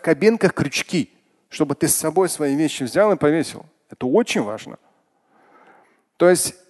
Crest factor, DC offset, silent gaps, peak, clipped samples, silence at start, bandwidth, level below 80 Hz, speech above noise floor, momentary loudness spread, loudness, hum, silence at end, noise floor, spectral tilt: 18 dB; under 0.1%; none; -2 dBFS; under 0.1%; 0.05 s; 12.5 kHz; -58 dBFS; 43 dB; 14 LU; -19 LUFS; none; 0.2 s; -62 dBFS; -4.5 dB/octave